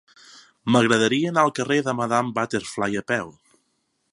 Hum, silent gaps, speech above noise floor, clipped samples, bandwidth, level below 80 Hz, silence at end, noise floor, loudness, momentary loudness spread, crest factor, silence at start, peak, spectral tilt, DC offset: none; none; 50 dB; under 0.1%; 11.5 kHz; -62 dBFS; 0.8 s; -72 dBFS; -22 LUFS; 8 LU; 22 dB; 0.65 s; -2 dBFS; -4.5 dB/octave; under 0.1%